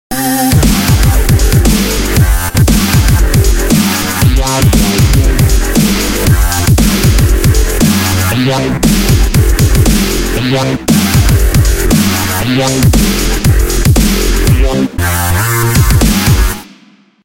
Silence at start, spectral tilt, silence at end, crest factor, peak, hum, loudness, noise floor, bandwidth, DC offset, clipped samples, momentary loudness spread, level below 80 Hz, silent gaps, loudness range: 0.1 s; -4.5 dB/octave; 0.6 s; 8 dB; 0 dBFS; none; -10 LUFS; -43 dBFS; 17.5 kHz; 0.2%; under 0.1%; 3 LU; -14 dBFS; none; 1 LU